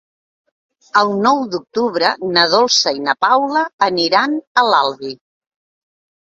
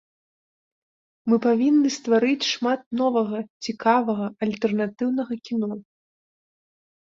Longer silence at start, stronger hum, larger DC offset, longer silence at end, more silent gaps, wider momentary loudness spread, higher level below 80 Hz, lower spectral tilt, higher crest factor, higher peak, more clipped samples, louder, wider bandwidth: second, 0.95 s vs 1.25 s; neither; neither; about the same, 1.15 s vs 1.25 s; about the same, 3.73-3.78 s, 4.47-4.55 s vs 2.86-2.91 s, 3.50-3.60 s; about the same, 7 LU vs 9 LU; first, -64 dBFS vs -70 dBFS; second, -2.5 dB/octave vs -5 dB/octave; about the same, 16 dB vs 16 dB; first, 0 dBFS vs -8 dBFS; neither; first, -15 LUFS vs -23 LUFS; about the same, 7.8 kHz vs 7.8 kHz